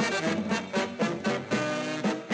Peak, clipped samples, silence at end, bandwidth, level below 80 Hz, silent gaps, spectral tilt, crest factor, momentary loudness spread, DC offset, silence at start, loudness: -14 dBFS; under 0.1%; 0 s; 10.5 kHz; -70 dBFS; none; -4.5 dB/octave; 14 dB; 2 LU; under 0.1%; 0 s; -29 LUFS